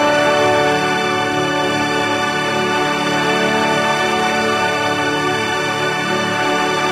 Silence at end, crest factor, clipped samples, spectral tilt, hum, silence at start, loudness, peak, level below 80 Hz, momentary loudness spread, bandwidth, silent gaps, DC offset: 0 s; 14 dB; under 0.1%; -3.5 dB/octave; none; 0 s; -16 LUFS; -2 dBFS; -52 dBFS; 3 LU; 16 kHz; none; under 0.1%